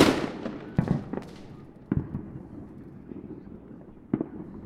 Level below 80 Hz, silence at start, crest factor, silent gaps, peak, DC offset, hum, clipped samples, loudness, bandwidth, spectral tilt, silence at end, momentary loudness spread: -50 dBFS; 0 s; 26 dB; none; -4 dBFS; under 0.1%; none; under 0.1%; -32 LUFS; 16 kHz; -6 dB/octave; 0 s; 17 LU